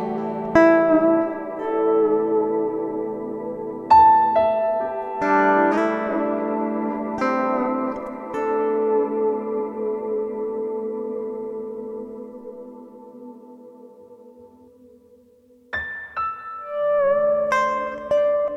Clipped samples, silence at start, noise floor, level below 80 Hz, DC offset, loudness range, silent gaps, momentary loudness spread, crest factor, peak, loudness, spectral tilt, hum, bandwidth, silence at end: under 0.1%; 0 s; -54 dBFS; -56 dBFS; under 0.1%; 17 LU; none; 16 LU; 20 dB; -2 dBFS; -21 LUFS; -7 dB/octave; none; 7.8 kHz; 0 s